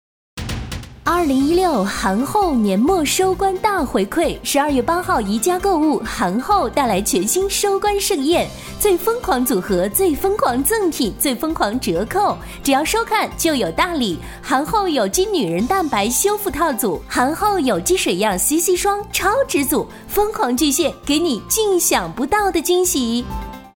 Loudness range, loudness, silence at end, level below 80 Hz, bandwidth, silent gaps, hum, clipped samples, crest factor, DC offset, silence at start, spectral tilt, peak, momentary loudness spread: 1 LU; -18 LUFS; 0.05 s; -38 dBFS; over 20 kHz; none; none; under 0.1%; 16 dB; under 0.1%; 0.35 s; -3.5 dB/octave; -2 dBFS; 4 LU